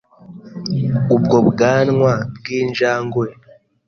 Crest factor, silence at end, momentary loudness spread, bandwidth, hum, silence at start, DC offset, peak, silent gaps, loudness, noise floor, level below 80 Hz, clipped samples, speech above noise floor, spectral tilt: 16 dB; 0.55 s; 10 LU; 6.8 kHz; none; 0.3 s; under 0.1%; -2 dBFS; none; -17 LUFS; -39 dBFS; -50 dBFS; under 0.1%; 23 dB; -7 dB/octave